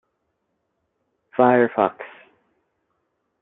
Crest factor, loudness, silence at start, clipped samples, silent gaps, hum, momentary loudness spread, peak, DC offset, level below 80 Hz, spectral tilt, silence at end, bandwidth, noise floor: 22 dB; -19 LUFS; 1.4 s; under 0.1%; none; none; 23 LU; -2 dBFS; under 0.1%; -74 dBFS; -10.5 dB/octave; 1.35 s; 4 kHz; -74 dBFS